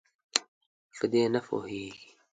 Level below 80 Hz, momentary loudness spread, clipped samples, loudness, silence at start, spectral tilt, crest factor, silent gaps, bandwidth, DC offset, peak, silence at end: -70 dBFS; 19 LU; under 0.1%; -31 LUFS; 0.35 s; -3.5 dB/octave; 32 dB; 0.48-0.90 s; 9.6 kHz; under 0.1%; 0 dBFS; 0.3 s